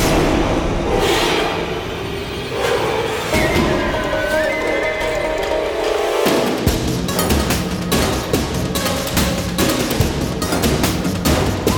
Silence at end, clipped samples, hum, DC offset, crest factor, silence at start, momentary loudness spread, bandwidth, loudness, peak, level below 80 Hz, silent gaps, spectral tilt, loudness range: 0 s; under 0.1%; none; under 0.1%; 14 dB; 0 s; 4 LU; 19 kHz; -18 LUFS; -2 dBFS; -28 dBFS; none; -4.5 dB/octave; 1 LU